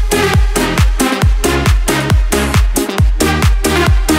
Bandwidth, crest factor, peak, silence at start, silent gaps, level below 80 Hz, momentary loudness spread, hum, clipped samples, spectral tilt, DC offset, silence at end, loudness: 16.5 kHz; 10 dB; 0 dBFS; 0 s; none; -14 dBFS; 2 LU; none; under 0.1%; -4.5 dB/octave; under 0.1%; 0 s; -13 LUFS